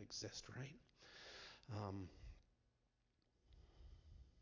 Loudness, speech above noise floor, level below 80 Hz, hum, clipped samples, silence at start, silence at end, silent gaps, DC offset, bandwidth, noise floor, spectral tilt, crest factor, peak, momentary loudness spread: -54 LUFS; 32 dB; -68 dBFS; none; under 0.1%; 0 s; 0 s; none; under 0.1%; 7.6 kHz; -84 dBFS; -4 dB/octave; 22 dB; -34 dBFS; 16 LU